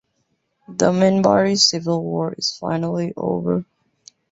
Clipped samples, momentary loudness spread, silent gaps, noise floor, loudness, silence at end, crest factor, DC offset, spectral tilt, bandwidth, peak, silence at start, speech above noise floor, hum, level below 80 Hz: under 0.1%; 9 LU; none; -70 dBFS; -19 LUFS; 0.7 s; 18 dB; under 0.1%; -4.5 dB/octave; 8 kHz; -2 dBFS; 0.7 s; 51 dB; none; -58 dBFS